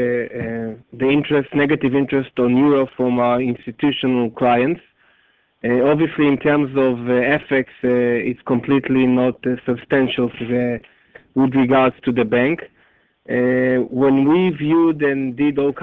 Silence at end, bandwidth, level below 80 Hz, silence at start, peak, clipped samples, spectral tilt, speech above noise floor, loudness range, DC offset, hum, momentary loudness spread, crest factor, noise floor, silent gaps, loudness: 0 s; 4.1 kHz; -52 dBFS; 0 s; -2 dBFS; under 0.1%; -9.5 dB/octave; 42 dB; 2 LU; under 0.1%; none; 8 LU; 14 dB; -59 dBFS; none; -18 LUFS